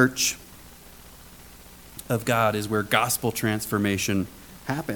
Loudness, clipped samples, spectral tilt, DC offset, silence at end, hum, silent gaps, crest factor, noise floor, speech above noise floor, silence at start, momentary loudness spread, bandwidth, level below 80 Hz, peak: -25 LUFS; under 0.1%; -4 dB/octave; under 0.1%; 0 s; none; none; 22 dB; -47 dBFS; 22 dB; 0 s; 24 LU; 19 kHz; -52 dBFS; -4 dBFS